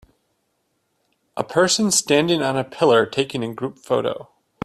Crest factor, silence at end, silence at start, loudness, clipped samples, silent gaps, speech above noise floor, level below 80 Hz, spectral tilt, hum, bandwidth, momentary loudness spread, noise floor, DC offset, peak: 18 dB; 0.4 s; 1.35 s; -19 LUFS; under 0.1%; none; 51 dB; -62 dBFS; -3.5 dB/octave; none; 14.5 kHz; 13 LU; -70 dBFS; under 0.1%; -2 dBFS